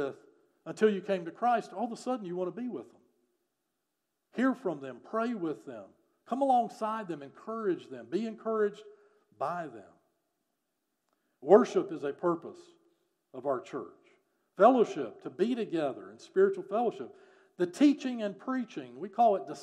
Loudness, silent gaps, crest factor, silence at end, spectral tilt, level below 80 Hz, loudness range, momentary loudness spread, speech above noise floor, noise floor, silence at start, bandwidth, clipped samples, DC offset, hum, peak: -31 LUFS; none; 24 dB; 0 s; -6.5 dB/octave; under -90 dBFS; 7 LU; 17 LU; 53 dB; -84 dBFS; 0 s; 10.5 kHz; under 0.1%; under 0.1%; none; -8 dBFS